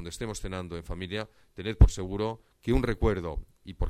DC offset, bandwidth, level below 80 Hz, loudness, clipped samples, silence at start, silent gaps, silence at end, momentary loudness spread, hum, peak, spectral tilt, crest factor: under 0.1%; 13 kHz; -32 dBFS; -30 LUFS; under 0.1%; 0 s; none; 0 s; 15 LU; none; -6 dBFS; -6.5 dB/octave; 22 dB